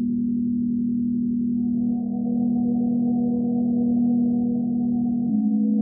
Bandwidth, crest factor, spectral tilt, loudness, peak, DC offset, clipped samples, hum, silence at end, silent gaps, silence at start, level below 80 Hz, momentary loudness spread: 0.8 kHz; 10 dB; -8.5 dB/octave; -23 LUFS; -12 dBFS; under 0.1%; under 0.1%; none; 0 s; none; 0 s; -52 dBFS; 3 LU